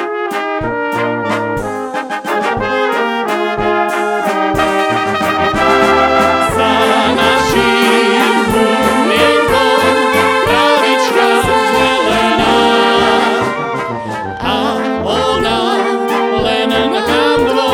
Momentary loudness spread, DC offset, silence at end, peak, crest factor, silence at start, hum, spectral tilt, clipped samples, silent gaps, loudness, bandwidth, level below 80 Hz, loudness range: 7 LU; under 0.1%; 0 s; 0 dBFS; 12 dB; 0 s; none; -4 dB/octave; under 0.1%; none; -12 LUFS; 19.5 kHz; -38 dBFS; 5 LU